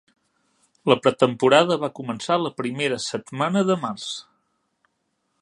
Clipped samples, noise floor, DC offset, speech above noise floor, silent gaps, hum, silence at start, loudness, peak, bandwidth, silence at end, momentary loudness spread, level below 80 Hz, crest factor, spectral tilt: under 0.1%; -73 dBFS; under 0.1%; 52 dB; none; none; 0.85 s; -22 LUFS; 0 dBFS; 11 kHz; 1.2 s; 13 LU; -68 dBFS; 22 dB; -5 dB/octave